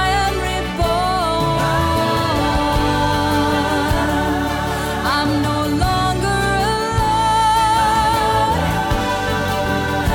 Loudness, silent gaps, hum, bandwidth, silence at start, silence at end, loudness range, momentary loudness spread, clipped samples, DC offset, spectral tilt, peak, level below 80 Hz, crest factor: -17 LUFS; none; none; 20 kHz; 0 s; 0 s; 2 LU; 4 LU; under 0.1%; under 0.1%; -5 dB/octave; -6 dBFS; -28 dBFS; 12 dB